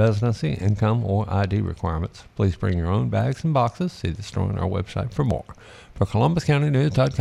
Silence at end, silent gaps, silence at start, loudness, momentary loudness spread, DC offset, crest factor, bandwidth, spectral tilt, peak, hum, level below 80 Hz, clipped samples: 0 s; none; 0 s; -23 LUFS; 7 LU; under 0.1%; 16 dB; 11 kHz; -8 dB/octave; -6 dBFS; none; -40 dBFS; under 0.1%